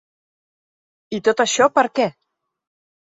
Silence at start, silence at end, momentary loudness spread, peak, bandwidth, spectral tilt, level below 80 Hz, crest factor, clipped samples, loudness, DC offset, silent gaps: 1.1 s; 1 s; 8 LU; -2 dBFS; 7.8 kHz; -3 dB/octave; -68 dBFS; 20 dB; under 0.1%; -18 LUFS; under 0.1%; none